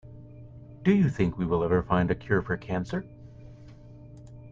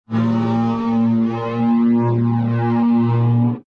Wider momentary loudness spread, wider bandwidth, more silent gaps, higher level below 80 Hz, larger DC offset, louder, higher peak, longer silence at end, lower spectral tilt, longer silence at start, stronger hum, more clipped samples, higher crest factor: first, 25 LU vs 3 LU; first, 7.4 kHz vs 5.2 kHz; neither; about the same, -50 dBFS vs -52 dBFS; second, under 0.1% vs 0.1%; second, -27 LUFS vs -17 LUFS; about the same, -10 dBFS vs -8 dBFS; about the same, 0 s vs 0.05 s; second, -8.5 dB/octave vs -10 dB/octave; about the same, 0.05 s vs 0.1 s; neither; neither; first, 18 dB vs 10 dB